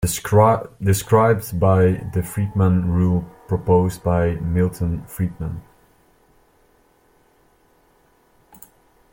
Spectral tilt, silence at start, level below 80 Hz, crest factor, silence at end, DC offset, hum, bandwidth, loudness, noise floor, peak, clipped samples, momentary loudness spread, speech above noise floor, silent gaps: -7 dB/octave; 0 s; -42 dBFS; 18 dB; 3.5 s; under 0.1%; none; 17 kHz; -19 LUFS; -58 dBFS; -2 dBFS; under 0.1%; 10 LU; 40 dB; none